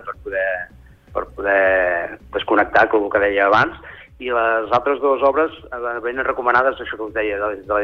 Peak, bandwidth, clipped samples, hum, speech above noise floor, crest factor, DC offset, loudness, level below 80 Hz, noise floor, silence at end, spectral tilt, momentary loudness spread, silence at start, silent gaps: -2 dBFS; 6.6 kHz; under 0.1%; none; 26 dB; 16 dB; under 0.1%; -19 LUFS; -46 dBFS; -44 dBFS; 0 s; -6 dB/octave; 13 LU; 0 s; none